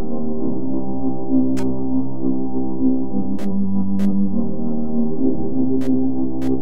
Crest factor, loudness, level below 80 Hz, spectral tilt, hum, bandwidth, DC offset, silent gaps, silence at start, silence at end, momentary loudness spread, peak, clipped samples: 12 dB; -22 LUFS; -44 dBFS; -9.5 dB/octave; none; 8.6 kHz; 20%; none; 0 s; 0 s; 5 LU; -4 dBFS; under 0.1%